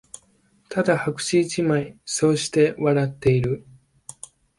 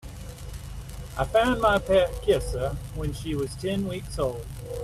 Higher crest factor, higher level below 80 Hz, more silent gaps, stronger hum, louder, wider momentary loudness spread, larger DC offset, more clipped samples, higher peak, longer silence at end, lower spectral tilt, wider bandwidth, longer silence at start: about the same, 18 dB vs 18 dB; second, -52 dBFS vs -38 dBFS; neither; neither; first, -22 LUFS vs -26 LUFS; about the same, 20 LU vs 18 LU; neither; neither; about the same, -6 dBFS vs -8 dBFS; first, 1 s vs 0 s; about the same, -5.5 dB/octave vs -5.5 dB/octave; second, 11.5 kHz vs 15 kHz; first, 0.7 s vs 0.05 s